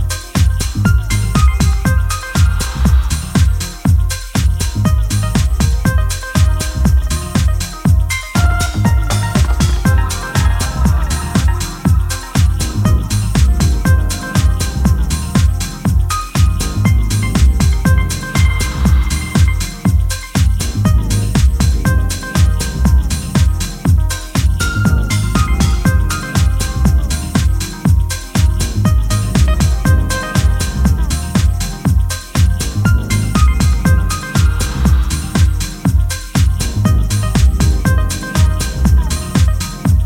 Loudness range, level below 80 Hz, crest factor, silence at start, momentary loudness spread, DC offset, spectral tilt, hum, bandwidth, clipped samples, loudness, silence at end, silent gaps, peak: 1 LU; -16 dBFS; 12 dB; 0 s; 3 LU; under 0.1%; -5 dB/octave; none; 16.5 kHz; under 0.1%; -15 LUFS; 0 s; none; 0 dBFS